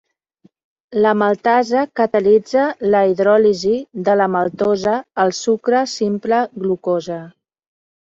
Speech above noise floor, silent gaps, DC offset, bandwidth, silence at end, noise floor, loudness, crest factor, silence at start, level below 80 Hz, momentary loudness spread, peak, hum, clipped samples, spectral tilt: 40 dB; none; under 0.1%; 7.8 kHz; 0.7 s; -56 dBFS; -17 LUFS; 14 dB; 0.9 s; -60 dBFS; 7 LU; -4 dBFS; none; under 0.1%; -5.5 dB/octave